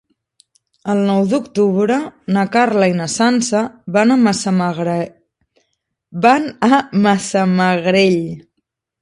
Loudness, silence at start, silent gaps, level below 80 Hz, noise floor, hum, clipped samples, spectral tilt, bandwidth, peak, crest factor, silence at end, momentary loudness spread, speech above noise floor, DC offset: -15 LUFS; 0.85 s; none; -58 dBFS; -72 dBFS; none; under 0.1%; -5.5 dB/octave; 11.5 kHz; 0 dBFS; 16 dB; 0.65 s; 7 LU; 58 dB; under 0.1%